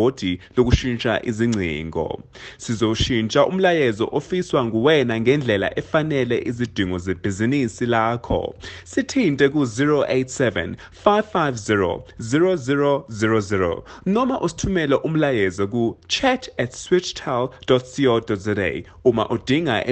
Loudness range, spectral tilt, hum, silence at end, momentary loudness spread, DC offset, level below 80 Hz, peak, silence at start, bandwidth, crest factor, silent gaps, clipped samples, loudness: 2 LU; -5.5 dB/octave; none; 0 s; 7 LU; under 0.1%; -42 dBFS; 0 dBFS; 0 s; 8.8 kHz; 20 dB; none; under 0.1%; -21 LUFS